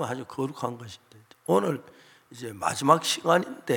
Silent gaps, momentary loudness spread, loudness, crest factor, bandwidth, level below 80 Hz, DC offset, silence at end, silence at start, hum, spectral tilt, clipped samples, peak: none; 18 LU; -26 LUFS; 24 dB; 17 kHz; -76 dBFS; under 0.1%; 0 s; 0 s; none; -4.5 dB/octave; under 0.1%; -4 dBFS